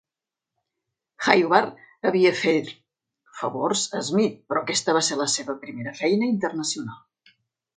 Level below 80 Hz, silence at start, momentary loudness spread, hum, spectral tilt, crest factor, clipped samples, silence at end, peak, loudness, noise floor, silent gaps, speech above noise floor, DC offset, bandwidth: -70 dBFS; 1.2 s; 12 LU; none; -3.5 dB/octave; 24 dB; under 0.1%; 0.8 s; 0 dBFS; -23 LUFS; -88 dBFS; none; 65 dB; under 0.1%; 9.6 kHz